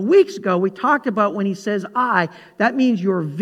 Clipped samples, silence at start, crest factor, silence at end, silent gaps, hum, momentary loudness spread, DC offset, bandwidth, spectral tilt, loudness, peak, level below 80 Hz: under 0.1%; 0 s; 16 dB; 0 s; none; none; 6 LU; under 0.1%; 9.4 kHz; -7 dB/octave; -19 LUFS; -2 dBFS; -72 dBFS